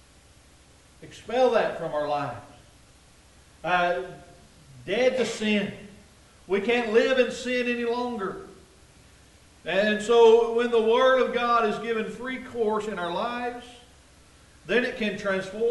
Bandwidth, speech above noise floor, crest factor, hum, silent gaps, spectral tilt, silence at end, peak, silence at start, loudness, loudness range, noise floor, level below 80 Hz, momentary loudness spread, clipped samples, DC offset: 11.5 kHz; 30 dB; 20 dB; none; none; -4.5 dB/octave; 0 s; -6 dBFS; 1 s; -25 LUFS; 7 LU; -55 dBFS; -58 dBFS; 14 LU; under 0.1%; under 0.1%